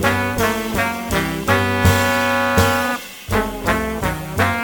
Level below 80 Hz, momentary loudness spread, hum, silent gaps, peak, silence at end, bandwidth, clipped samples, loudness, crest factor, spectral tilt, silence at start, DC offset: -34 dBFS; 7 LU; none; none; -2 dBFS; 0 s; 17.5 kHz; under 0.1%; -18 LUFS; 16 dB; -4.5 dB/octave; 0 s; under 0.1%